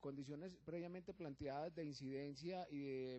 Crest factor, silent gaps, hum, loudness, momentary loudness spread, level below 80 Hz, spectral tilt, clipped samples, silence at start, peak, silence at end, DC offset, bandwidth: 14 dB; none; none; -51 LUFS; 5 LU; -74 dBFS; -6.5 dB/octave; under 0.1%; 0 s; -36 dBFS; 0 s; under 0.1%; 8.2 kHz